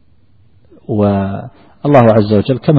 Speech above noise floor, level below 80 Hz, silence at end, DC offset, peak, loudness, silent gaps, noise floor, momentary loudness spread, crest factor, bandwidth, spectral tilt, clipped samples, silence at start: 40 dB; -44 dBFS; 0 s; under 0.1%; 0 dBFS; -12 LUFS; none; -51 dBFS; 13 LU; 12 dB; 5.2 kHz; -10 dB/octave; under 0.1%; 0.9 s